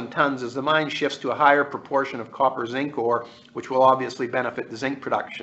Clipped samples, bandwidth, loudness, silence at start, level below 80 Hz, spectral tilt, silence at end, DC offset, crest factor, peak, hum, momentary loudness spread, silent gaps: under 0.1%; 8.2 kHz; -23 LUFS; 0 s; -68 dBFS; -5 dB/octave; 0 s; under 0.1%; 22 dB; -2 dBFS; none; 11 LU; none